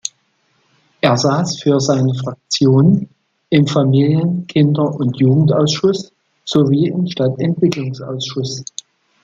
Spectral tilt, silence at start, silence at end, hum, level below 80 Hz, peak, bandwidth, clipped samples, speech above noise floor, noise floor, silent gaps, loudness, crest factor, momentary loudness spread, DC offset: -6.5 dB/octave; 0.05 s; 0.6 s; none; -56 dBFS; 0 dBFS; 7.8 kHz; under 0.1%; 47 dB; -61 dBFS; none; -15 LUFS; 14 dB; 11 LU; under 0.1%